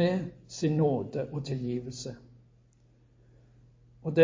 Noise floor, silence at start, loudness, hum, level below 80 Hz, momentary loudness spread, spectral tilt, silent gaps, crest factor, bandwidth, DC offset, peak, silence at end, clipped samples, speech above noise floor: -62 dBFS; 0 s; -32 LUFS; none; -62 dBFS; 13 LU; -7 dB/octave; none; 22 dB; 7.6 kHz; under 0.1%; -8 dBFS; 0 s; under 0.1%; 32 dB